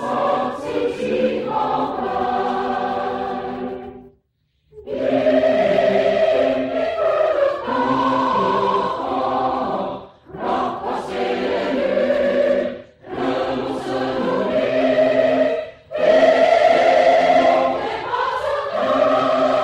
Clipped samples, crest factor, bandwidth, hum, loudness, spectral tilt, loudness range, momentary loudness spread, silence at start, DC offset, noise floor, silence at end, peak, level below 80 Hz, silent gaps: under 0.1%; 16 dB; 9.6 kHz; none; -19 LUFS; -5.5 dB/octave; 7 LU; 12 LU; 0 s; under 0.1%; -66 dBFS; 0 s; -2 dBFS; -52 dBFS; none